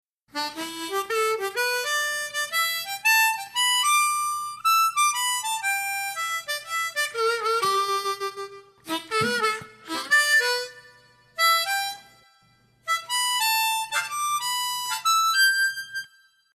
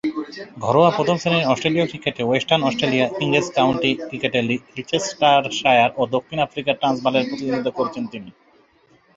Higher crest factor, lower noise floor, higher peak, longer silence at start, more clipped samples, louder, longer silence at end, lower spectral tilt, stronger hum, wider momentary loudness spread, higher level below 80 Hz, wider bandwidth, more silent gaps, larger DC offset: about the same, 16 dB vs 18 dB; first, -61 dBFS vs -56 dBFS; second, -10 dBFS vs -2 dBFS; first, 0.35 s vs 0.05 s; neither; second, -23 LUFS vs -20 LUFS; second, 0.5 s vs 0.85 s; second, 0.5 dB/octave vs -5 dB/octave; neither; first, 13 LU vs 9 LU; second, -74 dBFS vs -58 dBFS; first, 14 kHz vs 8 kHz; neither; neither